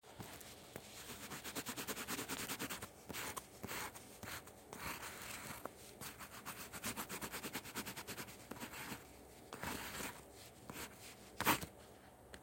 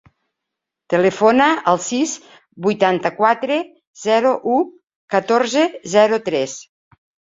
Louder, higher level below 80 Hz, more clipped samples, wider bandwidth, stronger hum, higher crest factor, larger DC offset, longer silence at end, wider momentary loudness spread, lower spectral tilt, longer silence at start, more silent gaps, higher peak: second, -46 LUFS vs -17 LUFS; about the same, -68 dBFS vs -64 dBFS; neither; first, 17 kHz vs 7.8 kHz; neither; first, 30 dB vs 18 dB; neither; second, 0 s vs 0.75 s; about the same, 12 LU vs 10 LU; second, -2.5 dB/octave vs -4 dB/octave; second, 0.05 s vs 0.9 s; second, none vs 3.87-3.94 s, 4.96-5.08 s; second, -18 dBFS vs 0 dBFS